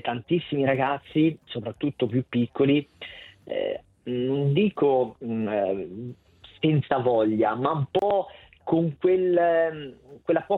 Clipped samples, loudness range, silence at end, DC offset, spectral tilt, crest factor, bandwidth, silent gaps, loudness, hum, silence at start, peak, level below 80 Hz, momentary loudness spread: under 0.1%; 3 LU; 0 s; under 0.1%; -9.5 dB/octave; 16 dB; 4.2 kHz; none; -25 LUFS; none; 0.05 s; -8 dBFS; -62 dBFS; 15 LU